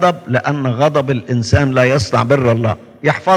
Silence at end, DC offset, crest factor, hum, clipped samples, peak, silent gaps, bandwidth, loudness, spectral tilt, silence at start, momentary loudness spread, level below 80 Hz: 0 s; under 0.1%; 14 dB; none; under 0.1%; 0 dBFS; none; 11.5 kHz; -15 LUFS; -6.5 dB/octave; 0 s; 5 LU; -42 dBFS